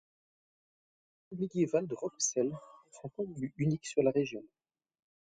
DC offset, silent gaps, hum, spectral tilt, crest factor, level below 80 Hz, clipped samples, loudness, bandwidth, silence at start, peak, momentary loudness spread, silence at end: under 0.1%; none; none; -5.5 dB/octave; 20 dB; -70 dBFS; under 0.1%; -34 LUFS; 10 kHz; 1.3 s; -16 dBFS; 16 LU; 0.8 s